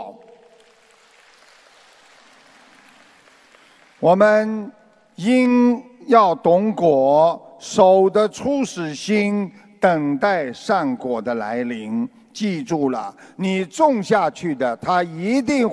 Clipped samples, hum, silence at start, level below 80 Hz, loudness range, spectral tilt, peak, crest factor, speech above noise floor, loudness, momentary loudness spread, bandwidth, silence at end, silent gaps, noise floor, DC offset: under 0.1%; none; 0 s; -62 dBFS; 6 LU; -6 dB/octave; 0 dBFS; 20 dB; 35 dB; -19 LUFS; 12 LU; 11 kHz; 0 s; none; -53 dBFS; under 0.1%